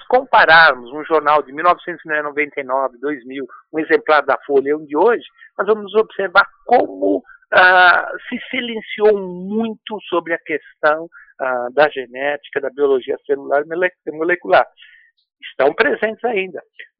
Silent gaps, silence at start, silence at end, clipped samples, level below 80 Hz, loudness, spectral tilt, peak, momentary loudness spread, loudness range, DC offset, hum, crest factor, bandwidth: none; 0.1 s; 0.15 s; under 0.1%; -58 dBFS; -16 LUFS; -8.5 dB/octave; 0 dBFS; 14 LU; 6 LU; under 0.1%; none; 16 dB; 5.4 kHz